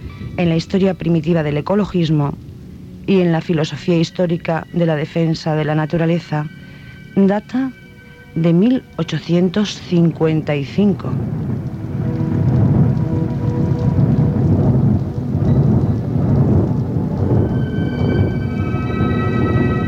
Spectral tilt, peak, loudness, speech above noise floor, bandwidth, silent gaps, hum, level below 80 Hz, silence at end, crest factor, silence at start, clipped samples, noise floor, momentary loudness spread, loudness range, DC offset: -8.5 dB/octave; -2 dBFS; -17 LUFS; 23 dB; 7.8 kHz; none; none; -34 dBFS; 0 s; 14 dB; 0 s; under 0.1%; -39 dBFS; 8 LU; 3 LU; under 0.1%